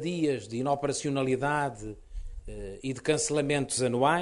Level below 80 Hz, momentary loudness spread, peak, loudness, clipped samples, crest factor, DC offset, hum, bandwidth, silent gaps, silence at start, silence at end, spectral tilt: -46 dBFS; 16 LU; -10 dBFS; -29 LUFS; under 0.1%; 18 dB; under 0.1%; none; 11.5 kHz; none; 0 s; 0 s; -4.5 dB/octave